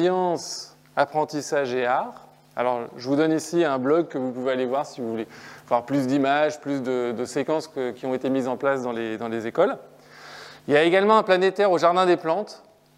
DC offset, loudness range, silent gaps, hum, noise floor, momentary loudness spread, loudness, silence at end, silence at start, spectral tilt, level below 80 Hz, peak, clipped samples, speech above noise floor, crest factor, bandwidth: under 0.1%; 5 LU; none; none; -45 dBFS; 14 LU; -23 LUFS; 0.4 s; 0 s; -5 dB/octave; -74 dBFS; -4 dBFS; under 0.1%; 22 dB; 20 dB; 15 kHz